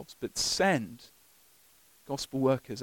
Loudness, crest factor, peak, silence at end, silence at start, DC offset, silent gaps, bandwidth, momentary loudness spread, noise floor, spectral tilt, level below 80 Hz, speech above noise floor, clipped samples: -30 LUFS; 18 dB; -14 dBFS; 0 s; 0 s; under 0.1%; none; 17.5 kHz; 15 LU; -62 dBFS; -3.5 dB/octave; -62 dBFS; 31 dB; under 0.1%